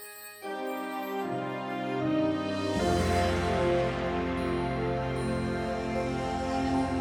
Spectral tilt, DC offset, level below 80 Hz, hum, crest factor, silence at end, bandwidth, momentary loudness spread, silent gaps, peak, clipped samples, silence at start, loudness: -6 dB/octave; under 0.1%; -44 dBFS; none; 14 dB; 0 s; over 20 kHz; 8 LU; none; -16 dBFS; under 0.1%; 0 s; -30 LUFS